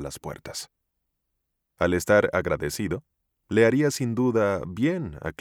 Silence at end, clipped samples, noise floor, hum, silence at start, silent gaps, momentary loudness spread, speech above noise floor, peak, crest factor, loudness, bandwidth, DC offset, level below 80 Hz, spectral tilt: 0.1 s; under 0.1%; -79 dBFS; none; 0 s; none; 15 LU; 55 dB; -6 dBFS; 20 dB; -24 LUFS; 18 kHz; under 0.1%; -50 dBFS; -5.5 dB/octave